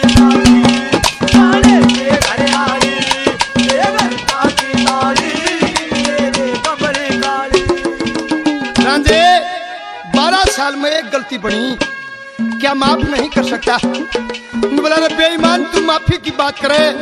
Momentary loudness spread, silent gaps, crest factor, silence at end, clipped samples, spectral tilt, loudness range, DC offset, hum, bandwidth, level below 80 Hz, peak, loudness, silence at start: 10 LU; none; 12 dB; 0 s; 0.1%; -4 dB/octave; 5 LU; under 0.1%; none; 13.5 kHz; -32 dBFS; 0 dBFS; -13 LUFS; 0 s